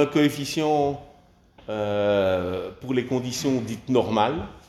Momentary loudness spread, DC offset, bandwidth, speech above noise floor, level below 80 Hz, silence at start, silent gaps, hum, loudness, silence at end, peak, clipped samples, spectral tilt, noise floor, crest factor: 9 LU; under 0.1%; 15 kHz; 31 dB; -54 dBFS; 0 s; none; none; -24 LUFS; 0.1 s; -6 dBFS; under 0.1%; -5.5 dB/octave; -54 dBFS; 18 dB